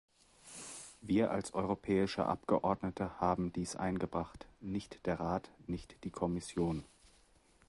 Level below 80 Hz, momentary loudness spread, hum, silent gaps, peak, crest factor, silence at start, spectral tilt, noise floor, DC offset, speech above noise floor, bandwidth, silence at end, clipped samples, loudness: -58 dBFS; 14 LU; none; none; -16 dBFS; 20 dB; 0.45 s; -6 dB/octave; -67 dBFS; under 0.1%; 31 dB; 11.5 kHz; 0.8 s; under 0.1%; -37 LUFS